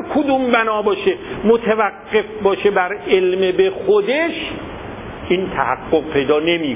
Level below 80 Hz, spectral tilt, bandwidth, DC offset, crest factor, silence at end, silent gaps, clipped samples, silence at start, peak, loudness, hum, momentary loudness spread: -44 dBFS; -9.5 dB/octave; 3.9 kHz; under 0.1%; 16 dB; 0 s; none; under 0.1%; 0 s; -2 dBFS; -17 LUFS; none; 9 LU